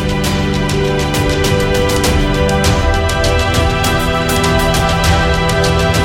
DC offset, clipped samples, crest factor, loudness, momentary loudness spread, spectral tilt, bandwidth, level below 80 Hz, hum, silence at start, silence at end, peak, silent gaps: under 0.1%; under 0.1%; 12 dB; -13 LUFS; 2 LU; -4.5 dB/octave; 17 kHz; -20 dBFS; none; 0 s; 0 s; -2 dBFS; none